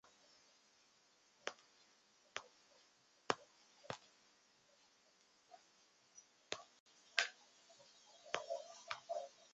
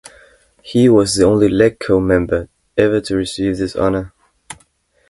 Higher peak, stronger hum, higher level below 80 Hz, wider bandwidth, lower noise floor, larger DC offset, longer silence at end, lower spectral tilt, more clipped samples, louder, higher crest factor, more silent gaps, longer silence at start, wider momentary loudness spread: second, -12 dBFS vs 0 dBFS; neither; second, -90 dBFS vs -38 dBFS; second, 8 kHz vs 11.5 kHz; first, -74 dBFS vs -57 dBFS; neither; second, 0.05 s vs 0.55 s; second, 0.5 dB/octave vs -5.5 dB/octave; neither; second, -47 LUFS vs -15 LUFS; first, 40 dB vs 16 dB; first, 6.80-6.86 s vs none; first, 1.45 s vs 0.65 s; first, 25 LU vs 22 LU